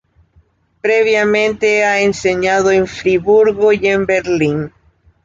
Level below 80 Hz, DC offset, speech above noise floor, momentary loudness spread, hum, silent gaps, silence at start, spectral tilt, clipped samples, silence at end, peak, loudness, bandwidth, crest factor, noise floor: -46 dBFS; under 0.1%; 41 dB; 4 LU; none; none; 0.85 s; -5 dB/octave; under 0.1%; 0.55 s; -2 dBFS; -13 LUFS; 7.8 kHz; 12 dB; -54 dBFS